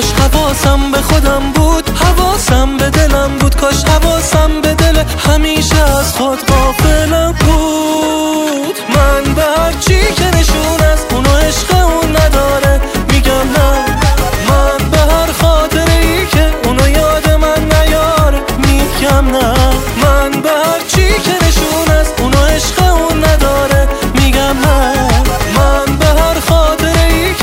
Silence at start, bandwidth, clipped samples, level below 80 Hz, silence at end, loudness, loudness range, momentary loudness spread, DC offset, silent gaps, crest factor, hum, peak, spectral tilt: 0 s; 16.5 kHz; under 0.1%; -14 dBFS; 0 s; -10 LUFS; 1 LU; 2 LU; under 0.1%; none; 10 dB; none; 0 dBFS; -4.5 dB/octave